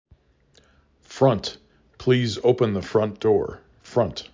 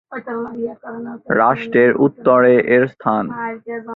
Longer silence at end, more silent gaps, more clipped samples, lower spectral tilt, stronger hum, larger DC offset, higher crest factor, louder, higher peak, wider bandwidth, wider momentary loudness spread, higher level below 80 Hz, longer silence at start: about the same, 0.1 s vs 0 s; neither; neither; second, -6.5 dB/octave vs -9.5 dB/octave; neither; neither; about the same, 20 dB vs 16 dB; second, -23 LUFS vs -16 LUFS; about the same, -4 dBFS vs -2 dBFS; first, 7.6 kHz vs 4.1 kHz; second, 9 LU vs 16 LU; first, -50 dBFS vs -60 dBFS; first, 1.1 s vs 0.1 s